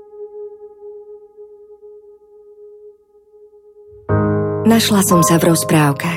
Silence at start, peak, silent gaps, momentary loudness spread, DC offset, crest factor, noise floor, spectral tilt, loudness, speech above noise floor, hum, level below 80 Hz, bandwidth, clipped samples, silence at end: 0.15 s; -2 dBFS; none; 24 LU; under 0.1%; 16 dB; -49 dBFS; -5 dB/octave; -14 LUFS; 36 dB; none; -46 dBFS; 17 kHz; under 0.1%; 0 s